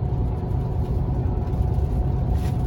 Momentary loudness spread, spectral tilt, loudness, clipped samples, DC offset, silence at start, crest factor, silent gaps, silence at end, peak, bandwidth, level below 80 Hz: 2 LU; -9.5 dB/octave; -25 LUFS; under 0.1%; under 0.1%; 0 s; 12 dB; none; 0 s; -10 dBFS; 16 kHz; -26 dBFS